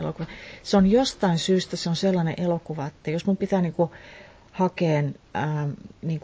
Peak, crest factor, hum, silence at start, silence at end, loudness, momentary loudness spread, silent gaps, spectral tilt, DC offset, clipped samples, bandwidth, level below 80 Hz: -6 dBFS; 18 dB; none; 0 s; 0.05 s; -25 LUFS; 13 LU; none; -6.5 dB/octave; under 0.1%; under 0.1%; 8 kHz; -52 dBFS